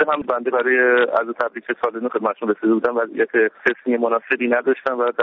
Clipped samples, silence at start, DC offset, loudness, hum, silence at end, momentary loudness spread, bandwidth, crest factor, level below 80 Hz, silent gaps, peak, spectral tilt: under 0.1%; 0 s; under 0.1%; -19 LUFS; none; 0 s; 7 LU; 6.2 kHz; 16 dB; -66 dBFS; none; -2 dBFS; -2.5 dB/octave